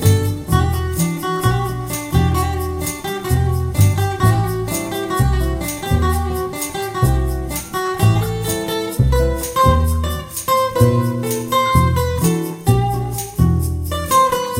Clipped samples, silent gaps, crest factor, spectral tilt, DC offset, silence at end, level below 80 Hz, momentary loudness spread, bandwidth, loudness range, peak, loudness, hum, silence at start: under 0.1%; none; 16 dB; -5.5 dB/octave; under 0.1%; 0 s; -26 dBFS; 8 LU; 17 kHz; 3 LU; 0 dBFS; -18 LUFS; none; 0 s